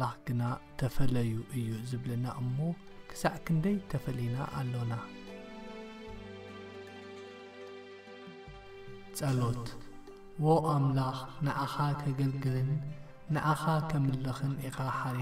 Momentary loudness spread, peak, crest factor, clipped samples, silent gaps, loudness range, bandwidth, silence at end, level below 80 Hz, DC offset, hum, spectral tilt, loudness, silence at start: 18 LU; -14 dBFS; 18 dB; under 0.1%; none; 14 LU; 15.5 kHz; 0 s; -52 dBFS; under 0.1%; none; -7 dB/octave; -33 LUFS; 0 s